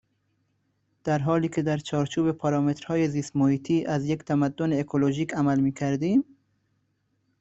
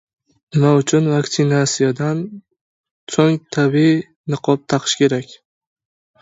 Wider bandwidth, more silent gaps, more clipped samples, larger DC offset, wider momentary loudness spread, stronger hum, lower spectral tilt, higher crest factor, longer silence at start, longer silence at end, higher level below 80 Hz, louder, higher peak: about the same, 8.2 kHz vs 8 kHz; second, none vs 2.61-2.84 s, 2.91-3.07 s, 4.16-4.24 s; neither; neither; second, 4 LU vs 9 LU; neither; first, -7 dB/octave vs -5.5 dB/octave; about the same, 16 dB vs 18 dB; first, 1.05 s vs 0.55 s; first, 1.2 s vs 0.9 s; about the same, -60 dBFS vs -60 dBFS; second, -26 LUFS vs -17 LUFS; second, -10 dBFS vs 0 dBFS